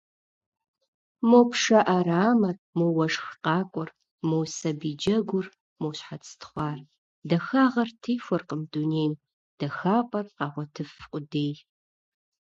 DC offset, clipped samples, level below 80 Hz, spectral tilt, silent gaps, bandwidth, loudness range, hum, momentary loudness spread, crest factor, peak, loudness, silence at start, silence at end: under 0.1%; under 0.1%; -66 dBFS; -6 dB/octave; 2.59-2.73 s, 4.11-4.18 s, 5.60-5.76 s, 6.98-7.22 s, 9.33-9.58 s; 7.8 kHz; 7 LU; none; 18 LU; 20 dB; -6 dBFS; -26 LUFS; 1.2 s; 0.85 s